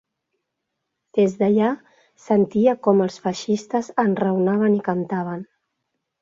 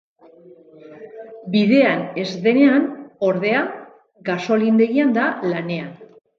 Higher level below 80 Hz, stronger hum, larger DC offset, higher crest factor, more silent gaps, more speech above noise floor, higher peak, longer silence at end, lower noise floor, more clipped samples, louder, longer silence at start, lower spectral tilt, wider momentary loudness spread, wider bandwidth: first, -64 dBFS vs -70 dBFS; neither; neither; about the same, 18 dB vs 16 dB; neither; first, 59 dB vs 29 dB; about the same, -4 dBFS vs -2 dBFS; first, 0.8 s vs 0.35 s; first, -79 dBFS vs -46 dBFS; neither; second, -21 LUFS vs -18 LUFS; first, 1.15 s vs 0.9 s; about the same, -7 dB/octave vs -7 dB/octave; second, 8 LU vs 21 LU; first, 7.6 kHz vs 6.8 kHz